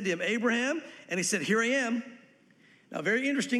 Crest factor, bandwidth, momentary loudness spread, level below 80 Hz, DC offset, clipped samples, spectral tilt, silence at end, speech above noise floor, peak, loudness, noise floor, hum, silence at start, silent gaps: 16 dB; 14 kHz; 10 LU; -86 dBFS; under 0.1%; under 0.1%; -3.5 dB/octave; 0 s; 32 dB; -14 dBFS; -29 LUFS; -61 dBFS; none; 0 s; none